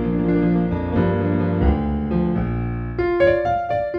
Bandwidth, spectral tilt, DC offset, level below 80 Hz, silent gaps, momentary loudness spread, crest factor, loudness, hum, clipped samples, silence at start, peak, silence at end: 5 kHz; -10 dB/octave; under 0.1%; -30 dBFS; none; 6 LU; 14 dB; -20 LUFS; none; under 0.1%; 0 s; -4 dBFS; 0 s